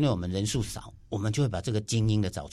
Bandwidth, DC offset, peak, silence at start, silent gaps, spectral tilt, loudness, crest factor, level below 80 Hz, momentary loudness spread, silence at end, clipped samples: 13 kHz; under 0.1%; -14 dBFS; 0 s; none; -5.5 dB/octave; -29 LUFS; 16 dB; -46 dBFS; 9 LU; 0 s; under 0.1%